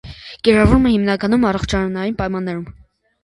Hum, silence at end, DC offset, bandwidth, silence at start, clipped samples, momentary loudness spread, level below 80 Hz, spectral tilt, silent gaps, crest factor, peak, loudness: none; 0.5 s; under 0.1%; 11.5 kHz; 0.05 s; under 0.1%; 15 LU; -30 dBFS; -6.5 dB/octave; none; 16 dB; 0 dBFS; -17 LUFS